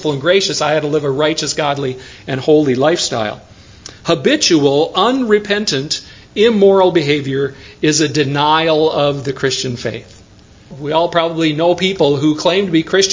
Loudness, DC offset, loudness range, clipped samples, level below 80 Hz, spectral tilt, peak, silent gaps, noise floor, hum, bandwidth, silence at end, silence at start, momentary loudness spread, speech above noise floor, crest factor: -14 LUFS; under 0.1%; 3 LU; under 0.1%; -48 dBFS; -4 dB/octave; 0 dBFS; none; -42 dBFS; none; 7.8 kHz; 0 s; 0 s; 11 LU; 28 dB; 14 dB